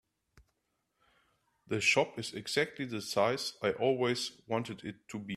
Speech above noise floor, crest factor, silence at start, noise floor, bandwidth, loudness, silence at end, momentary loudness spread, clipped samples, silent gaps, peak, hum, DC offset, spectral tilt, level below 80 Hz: 48 dB; 22 dB; 0.35 s; -81 dBFS; 15 kHz; -32 LUFS; 0 s; 13 LU; under 0.1%; none; -14 dBFS; none; under 0.1%; -4 dB/octave; -72 dBFS